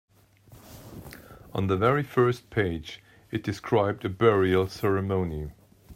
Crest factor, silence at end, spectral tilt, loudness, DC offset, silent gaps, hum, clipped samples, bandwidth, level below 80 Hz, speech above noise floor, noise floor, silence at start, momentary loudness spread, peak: 18 dB; 0 s; -7.5 dB/octave; -26 LUFS; under 0.1%; none; none; under 0.1%; 16 kHz; -52 dBFS; 30 dB; -55 dBFS; 0.5 s; 21 LU; -8 dBFS